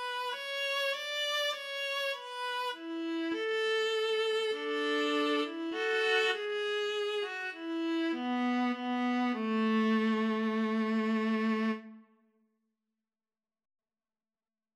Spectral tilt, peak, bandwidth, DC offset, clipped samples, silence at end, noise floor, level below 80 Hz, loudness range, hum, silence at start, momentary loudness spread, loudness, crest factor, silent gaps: -4 dB/octave; -16 dBFS; 14.5 kHz; under 0.1%; under 0.1%; 2.75 s; under -90 dBFS; under -90 dBFS; 4 LU; none; 0 s; 7 LU; -32 LUFS; 16 dB; none